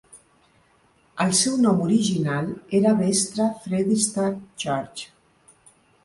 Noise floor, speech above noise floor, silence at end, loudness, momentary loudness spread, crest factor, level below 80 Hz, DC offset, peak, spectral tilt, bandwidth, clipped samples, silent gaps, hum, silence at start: -60 dBFS; 39 dB; 1 s; -22 LUFS; 11 LU; 18 dB; -62 dBFS; under 0.1%; -6 dBFS; -4.5 dB/octave; 11.5 kHz; under 0.1%; none; none; 0.15 s